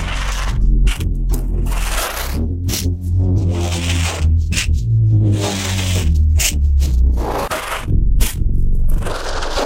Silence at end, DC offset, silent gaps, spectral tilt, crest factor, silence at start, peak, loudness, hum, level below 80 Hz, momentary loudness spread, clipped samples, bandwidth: 0 s; under 0.1%; none; -4.5 dB/octave; 14 dB; 0 s; 0 dBFS; -18 LUFS; none; -16 dBFS; 7 LU; under 0.1%; 16.5 kHz